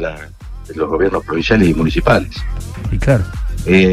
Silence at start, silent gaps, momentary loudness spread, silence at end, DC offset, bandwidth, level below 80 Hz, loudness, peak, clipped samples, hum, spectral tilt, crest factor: 0 s; none; 16 LU; 0 s; under 0.1%; 14.5 kHz; -24 dBFS; -16 LUFS; 0 dBFS; under 0.1%; none; -7 dB/octave; 14 dB